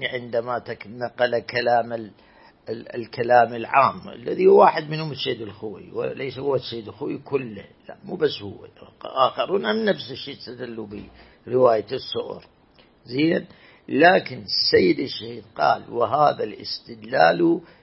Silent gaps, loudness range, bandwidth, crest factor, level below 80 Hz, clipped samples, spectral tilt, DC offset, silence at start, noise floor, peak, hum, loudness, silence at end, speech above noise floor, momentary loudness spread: none; 8 LU; 5.8 kHz; 22 dB; -62 dBFS; under 0.1%; -9 dB/octave; under 0.1%; 0 s; -55 dBFS; -2 dBFS; none; -22 LUFS; 0.2 s; 33 dB; 18 LU